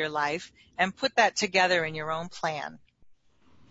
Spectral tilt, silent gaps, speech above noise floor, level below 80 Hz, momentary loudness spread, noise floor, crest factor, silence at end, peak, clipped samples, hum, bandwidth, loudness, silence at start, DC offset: -3 dB/octave; none; 33 dB; -66 dBFS; 13 LU; -62 dBFS; 22 dB; 0.95 s; -6 dBFS; under 0.1%; none; 8 kHz; -27 LUFS; 0 s; under 0.1%